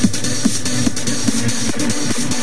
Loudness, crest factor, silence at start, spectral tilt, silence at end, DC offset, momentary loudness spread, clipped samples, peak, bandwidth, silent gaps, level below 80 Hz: -18 LUFS; 18 dB; 0 s; -3.5 dB/octave; 0 s; 10%; 1 LU; under 0.1%; 0 dBFS; 11 kHz; none; -46 dBFS